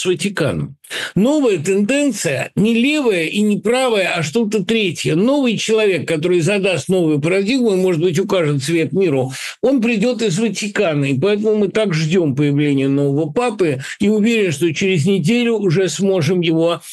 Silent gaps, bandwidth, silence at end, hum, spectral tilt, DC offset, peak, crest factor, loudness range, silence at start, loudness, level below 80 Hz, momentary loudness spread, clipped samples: none; 12.5 kHz; 0 s; none; -5.5 dB/octave; under 0.1%; -6 dBFS; 10 dB; 1 LU; 0 s; -16 LUFS; -56 dBFS; 4 LU; under 0.1%